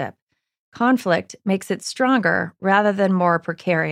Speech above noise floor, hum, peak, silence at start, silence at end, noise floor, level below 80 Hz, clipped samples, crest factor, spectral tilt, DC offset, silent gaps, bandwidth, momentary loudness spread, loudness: 45 dB; none; -2 dBFS; 0 s; 0 s; -64 dBFS; -68 dBFS; under 0.1%; 18 dB; -6 dB/octave; under 0.1%; 0.22-0.27 s, 0.59-0.72 s; 15 kHz; 7 LU; -20 LUFS